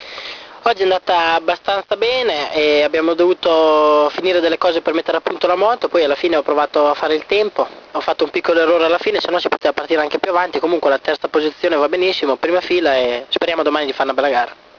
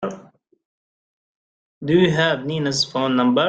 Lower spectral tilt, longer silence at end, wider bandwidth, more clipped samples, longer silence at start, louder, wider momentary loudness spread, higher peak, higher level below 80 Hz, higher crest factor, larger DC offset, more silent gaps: about the same, -4 dB/octave vs -5 dB/octave; first, 0.25 s vs 0 s; second, 5.4 kHz vs 9.2 kHz; neither; about the same, 0 s vs 0 s; first, -16 LUFS vs -19 LUFS; second, 5 LU vs 15 LU; first, 0 dBFS vs -4 dBFS; about the same, -56 dBFS vs -58 dBFS; about the same, 16 dB vs 18 dB; neither; second, none vs 0.65-1.81 s